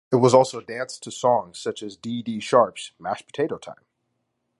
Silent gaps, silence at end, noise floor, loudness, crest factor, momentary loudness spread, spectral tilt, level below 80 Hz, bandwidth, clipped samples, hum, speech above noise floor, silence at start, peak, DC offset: none; 0.85 s; -75 dBFS; -23 LUFS; 22 dB; 16 LU; -5.5 dB/octave; -68 dBFS; 11.5 kHz; under 0.1%; none; 53 dB; 0.1 s; -2 dBFS; under 0.1%